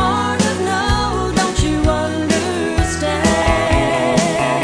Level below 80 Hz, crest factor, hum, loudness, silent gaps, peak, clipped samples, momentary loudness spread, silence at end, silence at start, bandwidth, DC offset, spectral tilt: -26 dBFS; 16 dB; none; -16 LUFS; none; 0 dBFS; under 0.1%; 3 LU; 0 s; 0 s; 11 kHz; under 0.1%; -4.5 dB/octave